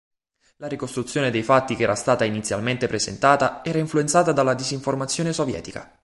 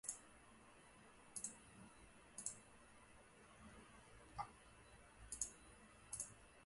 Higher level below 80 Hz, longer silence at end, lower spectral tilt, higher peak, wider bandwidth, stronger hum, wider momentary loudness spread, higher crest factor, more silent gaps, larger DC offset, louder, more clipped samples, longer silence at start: first, -54 dBFS vs -72 dBFS; first, 0.2 s vs 0 s; first, -4.5 dB/octave vs -1.5 dB/octave; first, -2 dBFS vs -24 dBFS; about the same, 11.5 kHz vs 11.5 kHz; neither; second, 10 LU vs 16 LU; second, 20 dB vs 32 dB; neither; neither; first, -22 LUFS vs -54 LUFS; neither; first, 0.6 s vs 0.05 s